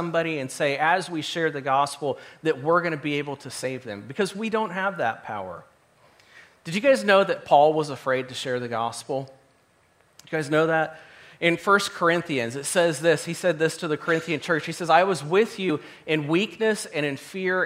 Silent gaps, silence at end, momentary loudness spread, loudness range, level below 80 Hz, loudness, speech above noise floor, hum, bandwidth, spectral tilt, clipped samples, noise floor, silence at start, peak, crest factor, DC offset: none; 0 s; 11 LU; 5 LU; -72 dBFS; -24 LUFS; 38 dB; none; 16 kHz; -4.5 dB/octave; under 0.1%; -62 dBFS; 0 s; -4 dBFS; 22 dB; under 0.1%